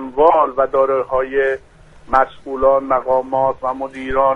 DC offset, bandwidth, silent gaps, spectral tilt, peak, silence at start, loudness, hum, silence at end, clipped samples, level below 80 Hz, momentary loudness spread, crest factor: under 0.1%; 5.8 kHz; none; -7 dB/octave; 0 dBFS; 0 s; -17 LUFS; none; 0 s; under 0.1%; -40 dBFS; 8 LU; 16 dB